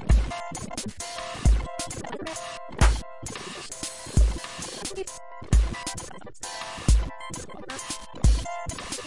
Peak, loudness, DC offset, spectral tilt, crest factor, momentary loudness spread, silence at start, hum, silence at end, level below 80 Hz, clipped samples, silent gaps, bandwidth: -6 dBFS; -29 LUFS; under 0.1%; -4.5 dB/octave; 20 dB; 12 LU; 0 s; none; 0 s; -28 dBFS; under 0.1%; none; 11.5 kHz